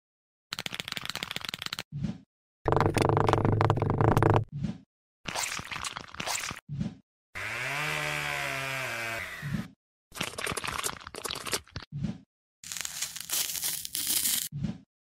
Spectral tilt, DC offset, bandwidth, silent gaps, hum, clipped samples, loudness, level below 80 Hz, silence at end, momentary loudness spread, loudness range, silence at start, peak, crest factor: -4 dB/octave; under 0.1%; 16.5 kHz; 1.85-1.91 s, 2.26-2.65 s, 4.86-5.24 s, 6.62-6.67 s, 7.03-7.33 s, 9.76-10.11 s, 11.87-11.91 s, 12.26-12.63 s; none; under 0.1%; -31 LUFS; -48 dBFS; 0.25 s; 13 LU; 7 LU; 0.5 s; -8 dBFS; 24 dB